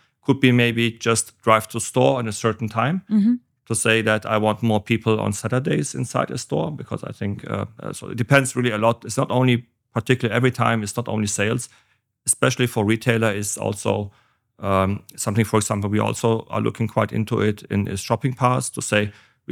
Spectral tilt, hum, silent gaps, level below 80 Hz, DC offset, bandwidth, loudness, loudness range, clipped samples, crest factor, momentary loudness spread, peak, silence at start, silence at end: -5 dB/octave; none; none; -62 dBFS; under 0.1%; 16.5 kHz; -21 LUFS; 3 LU; under 0.1%; 22 dB; 10 LU; 0 dBFS; 0.3 s; 0 s